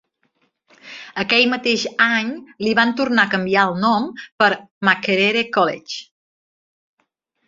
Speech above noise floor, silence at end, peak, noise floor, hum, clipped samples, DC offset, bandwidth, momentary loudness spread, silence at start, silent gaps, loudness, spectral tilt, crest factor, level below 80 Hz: 52 dB; 1.45 s; 0 dBFS; -70 dBFS; none; under 0.1%; under 0.1%; 7.6 kHz; 13 LU; 0.85 s; 4.32-4.38 s, 4.71-4.81 s; -17 LUFS; -4 dB/octave; 20 dB; -64 dBFS